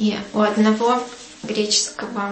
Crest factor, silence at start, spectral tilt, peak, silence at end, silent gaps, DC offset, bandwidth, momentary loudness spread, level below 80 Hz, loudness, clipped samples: 14 dB; 0 s; -3.5 dB/octave; -6 dBFS; 0 s; none; under 0.1%; 8.8 kHz; 10 LU; -58 dBFS; -19 LUFS; under 0.1%